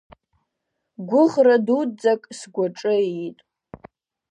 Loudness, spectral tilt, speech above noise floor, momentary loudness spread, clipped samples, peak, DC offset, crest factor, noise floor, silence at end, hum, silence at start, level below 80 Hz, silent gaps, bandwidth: -20 LUFS; -6 dB/octave; 59 dB; 16 LU; under 0.1%; -4 dBFS; under 0.1%; 18 dB; -78 dBFS; 0.95 s; none; 1 s; -66 dBFS; none; 9.8 kHz